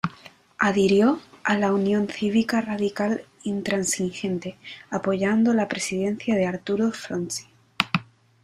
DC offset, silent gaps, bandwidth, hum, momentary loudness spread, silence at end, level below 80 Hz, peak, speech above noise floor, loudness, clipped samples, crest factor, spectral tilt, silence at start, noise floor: under 0.1%; none; 13 kHz; none; 10 LU; 0.4 s; -62 dBFS; 0 dBFS; 26 dB; -24 LUFS; under 0.1%; 24 dB; -5 dB/octave; 0.05 s; -49 dBFS